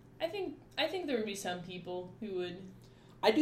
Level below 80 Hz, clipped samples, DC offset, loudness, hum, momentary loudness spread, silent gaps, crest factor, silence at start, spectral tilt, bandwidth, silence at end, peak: -68 dBFS; under 0.1%; under 0.1%; -37 LUFS; none; 11 LU; none; 24 dB; 0.05 s; -4 dB/octave; 16 kHz; 0 s; -12 dBFS